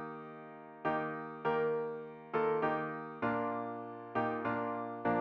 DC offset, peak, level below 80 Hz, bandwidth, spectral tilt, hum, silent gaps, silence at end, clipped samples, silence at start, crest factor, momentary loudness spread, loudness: under 0.1%; -20 dBFS; -74 dBFS; 5.4 kHz; -9 dB/octave; none; none; 0 s; under 0.1%; 0 s; 16 dB; 12 LU; -37 LUFS